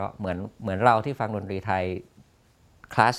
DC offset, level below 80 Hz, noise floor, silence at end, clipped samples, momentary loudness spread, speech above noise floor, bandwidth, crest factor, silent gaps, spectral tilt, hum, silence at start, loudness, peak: under 0.1%; -58 dBFS; -60 dBFS; 0 s; under 0.1%; 11 LU; 34 dB; 14.5 kHz; 24 dB; none; -6.5 dB/octave; none; 0 s; -26 LUFS; -2 dBFS